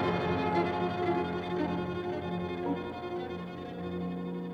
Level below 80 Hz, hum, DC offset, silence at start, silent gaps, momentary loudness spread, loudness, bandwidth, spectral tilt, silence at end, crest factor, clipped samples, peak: -60 dBFS; none; under 0.1%; 0 s; none; 8 LU; -33 LUFS; 7.6 kHz; -8 dB/octave; 0 s; 16 dB; under 0.1%; -18 dBFS